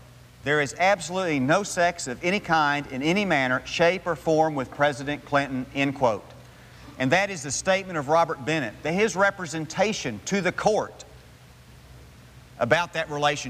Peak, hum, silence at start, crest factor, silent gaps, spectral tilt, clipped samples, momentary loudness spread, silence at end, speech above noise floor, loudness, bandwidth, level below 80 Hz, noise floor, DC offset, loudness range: -6 dBFS; none; 0.45 s; 18 dB; none; -4 dB/octave; under 0.1%; 6 LU; 0 s; 25 dB; -24 LUFS; 15.5 kHz; -54 dBFS; -49 dBFS; under 0.1%; 4 LU